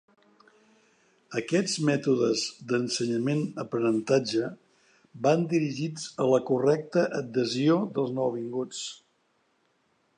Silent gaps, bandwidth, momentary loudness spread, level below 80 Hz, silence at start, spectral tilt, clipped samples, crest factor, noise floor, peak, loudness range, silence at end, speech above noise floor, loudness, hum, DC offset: none; 11 kHz; 9 LU; -76 dBFS; 1.3 s; -5.5 dB/octave; under 0.1%; 20 dB; -71 dBFS; -8 dBFS; 2 LU; 1.2 s; 44 dB; -27 LUFS; none; under 0.1%